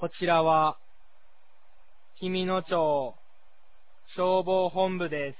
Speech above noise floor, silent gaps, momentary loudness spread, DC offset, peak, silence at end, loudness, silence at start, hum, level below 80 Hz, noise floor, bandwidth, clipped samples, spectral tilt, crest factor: 39 dB; none; 14 LU; 0.8%; -12 dBFS; 0.05 s; -27 LUFS; 0 s; none; -68 dBFS; -66 dBFS; 4 kHz; under 0.1%; -9.5 dB/octave; 18 dB